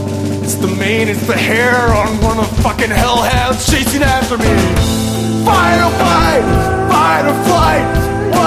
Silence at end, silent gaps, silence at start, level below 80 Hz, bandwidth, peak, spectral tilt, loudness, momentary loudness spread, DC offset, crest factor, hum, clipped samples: 0 s; none; 0 s; -22 dBFS; 15.5 kHz; 0 dBFS; -5 dB/octave; -12 LUFS; 4 LU; under 0.1%; 12 dB; none; under 0.1%